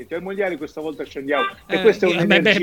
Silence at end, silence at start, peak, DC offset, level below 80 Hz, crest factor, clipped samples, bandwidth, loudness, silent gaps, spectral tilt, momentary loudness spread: 0 s; 0 s; 0 dBFS; under 0.1%; -56 dBFS; 20 dB; under 0.1%; 17 kHz; -20 LUFS; none; -5.5 dB/octave; 14 LU